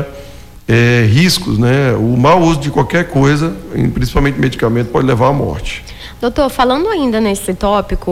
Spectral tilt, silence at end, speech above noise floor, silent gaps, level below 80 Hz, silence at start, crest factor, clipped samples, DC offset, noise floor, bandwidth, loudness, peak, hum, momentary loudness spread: -6 dB/octave; 0 s; 21 dB; none; -28 dBFS; 0 s; 12 dB; under 0.1%; under 0.1%; -33 dBFS; 16 kHz; -13 LUFS; -2 dBFS; none; 10 LU